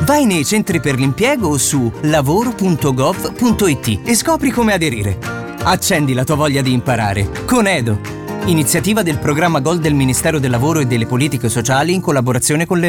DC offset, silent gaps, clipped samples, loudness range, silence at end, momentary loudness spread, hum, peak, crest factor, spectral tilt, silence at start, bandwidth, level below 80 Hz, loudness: under 0.1%; none; under 0.1%; 1 LU; 0 s; 4 LU; none; -4 dBFS; 12 dB; -5 dB/octave; 0 s; 18 kHz; -36 dBFS; -15 LUFS